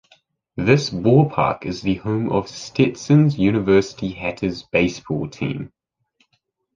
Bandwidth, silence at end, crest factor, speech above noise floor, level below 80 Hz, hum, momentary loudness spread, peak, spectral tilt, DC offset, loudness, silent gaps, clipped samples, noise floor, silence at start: 7.6 kHz; 1.1 s; 18 dB; 51 dB; -48 dBFS; none; 11 LU; -2 dBFS; -7 dB/octave; under 0.1%; -20 LUFS; none; under 0.1%; -70 dBFS; 0.55 s